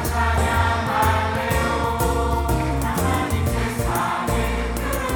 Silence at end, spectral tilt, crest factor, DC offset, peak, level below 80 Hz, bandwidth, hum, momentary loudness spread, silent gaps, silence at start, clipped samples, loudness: 0 s; -5 dB/octave; 14 dB; under 0.1%; -6 dBFS; -28 dBFS; over 20 kHz; none; 4 LU; none; 0 s; under 0.1%; -21 LUFS